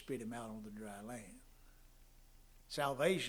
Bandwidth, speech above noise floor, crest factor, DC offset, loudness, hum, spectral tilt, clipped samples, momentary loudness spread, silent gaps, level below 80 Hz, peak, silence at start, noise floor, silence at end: over 20 kHz; 22 dB; 22 dB; under 0.1%; -43 LUFS; 60 Hz at -75 dBFS; -4.5 dB/octave; under 0.1%; 17 LU; none; -64 dBFS; -20 dBFS; 0 s; -62 dBFS; 0 s